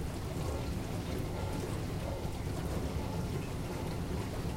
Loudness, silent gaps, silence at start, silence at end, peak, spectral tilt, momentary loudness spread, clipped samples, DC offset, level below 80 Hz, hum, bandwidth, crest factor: -38 LUFS; none; 0 s; 0 s; -24 dBFS; -6 dB/octave; 2 LU; under 0.1%; under 0.1%; -42 dBFS; none; 16 kHz; 12 dB